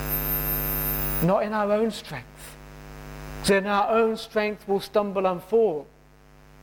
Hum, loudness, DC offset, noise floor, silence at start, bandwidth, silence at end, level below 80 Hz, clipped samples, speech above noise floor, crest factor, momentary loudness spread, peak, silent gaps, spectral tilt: none; -24 LUFS; under 0.1%; -53 dBFS; 0 s; 17 kHz; 0.8 s; -42 dBFS; under 0.1%; 29 dB; 16 dB; 20 LU; -10 dBFS; none; -5.5 dB/octave